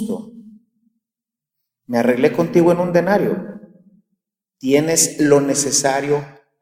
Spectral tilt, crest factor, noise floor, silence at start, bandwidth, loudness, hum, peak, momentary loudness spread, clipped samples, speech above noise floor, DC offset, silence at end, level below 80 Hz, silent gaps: -4 dB/octave; 18 dB; -87 dBFS; 0 s; 16.5 kHz; -16 LUFS; none; -2 dBFS; 13 LU; under 0.1%; 70 dB; under 0.1%; 0.3 s; -62 dBFS; none